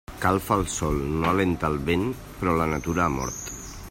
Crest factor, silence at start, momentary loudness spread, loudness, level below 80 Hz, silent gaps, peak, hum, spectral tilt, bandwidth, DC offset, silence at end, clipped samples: 20 dB; 0.1 s; 8 LU; -25 LUFS; -40 dBFS; none; -6 dBFS; none; -5.5 dB/octave; 16.5 kHz; under 0.1%; 0 s; under 0.1%